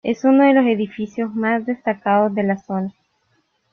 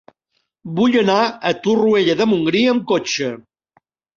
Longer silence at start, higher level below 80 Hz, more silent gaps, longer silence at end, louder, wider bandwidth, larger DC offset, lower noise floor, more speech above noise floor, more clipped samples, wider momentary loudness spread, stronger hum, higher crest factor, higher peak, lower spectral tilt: second, 0.05 s vs 0.65 s; about the same, -64 dBFS vs -60 dBFS; neither; about the same, 0.8 s vs 0.75 s; about the same, -18 LUFS vs -17 LUFS; second, 6.4 kHz vs 7.4 kHz; neither; second, -65 dBFS vs -71 dBFS; second, 47 dB vs 54 dB; neither; first, 12 LU vs 8 LU; neither; about the same, 16 dB vs 16 dB; about the same, -2 dBFS vs -2 dBFS; first, -7.5 dB/octave vs -5 dB/octave